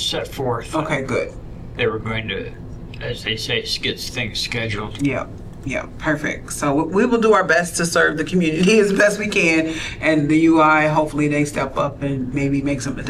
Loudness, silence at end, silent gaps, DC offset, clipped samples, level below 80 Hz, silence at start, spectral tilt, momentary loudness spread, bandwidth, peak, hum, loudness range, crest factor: -19 LUFS; 0 s; none; under 0.1%; under 0.1%; -40 dBFS; 0 s; -4.5 dB/octave; 12 LU; 14.5 kHz; -4 dBFS; none; 8 LU; 16 dB